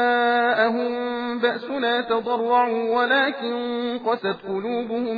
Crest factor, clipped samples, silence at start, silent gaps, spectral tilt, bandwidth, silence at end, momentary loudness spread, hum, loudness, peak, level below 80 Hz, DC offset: 16 dB; under 0.1%; 0 s; none; -6.5 dB/octave; 5 kHz; 0 s; 7 LU; none; -22 LUFS; -6 dBFS; -68 dBFS; under 0.1%